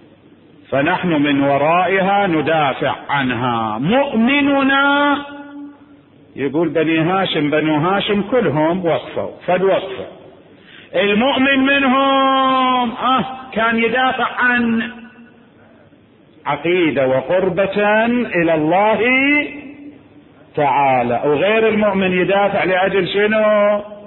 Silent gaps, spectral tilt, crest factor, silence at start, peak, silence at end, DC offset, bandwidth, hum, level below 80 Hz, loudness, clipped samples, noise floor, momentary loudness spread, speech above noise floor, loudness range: none; -11 dB/octave; 12 dB; 0.7 s; -4 dBFS; 0 s; under 0.1%; 4.2 kHz; none; -52 dBFS; -15 LUFS; under 0.1%; -48 dBFS; 8 LU; 33 dB; 4 LU